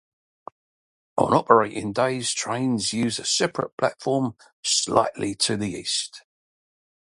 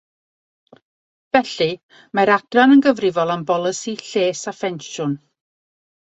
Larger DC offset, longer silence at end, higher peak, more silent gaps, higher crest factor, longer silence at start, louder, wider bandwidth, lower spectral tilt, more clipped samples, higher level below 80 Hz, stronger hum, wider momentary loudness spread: neither; about the same, 0.95 s vs 0.95 s; about the same, 0 dBFS vs 0 dBFS; first, 3.72-3.78 s, 4.53-4.63 s vs 1.83-1.89 s; about the same, 24 dB vs 20 dB; second, 1.15 s vs 1.35 s; second, -23 LUFS vs -18 LUFS; first, 11.5 kHz vs 8.2 kHz; about the same, -3.5 dB/octave vs -4.5 dB/octave; neither; about the same, -60 dBFS vs -64 dBFS; neither; second, 8 LU vs 13 LU